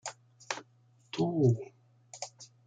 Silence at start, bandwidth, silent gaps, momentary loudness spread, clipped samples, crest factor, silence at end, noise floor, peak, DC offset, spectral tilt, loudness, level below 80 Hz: 0.05 s; 9.4 kHz; none; 18 LU; under 0.1%; 20 dB; 0.2 s; -65 dBFS; -16 dBFS; under 0.1%; -6 dB/octave; -33 LUFS; -74 dBFS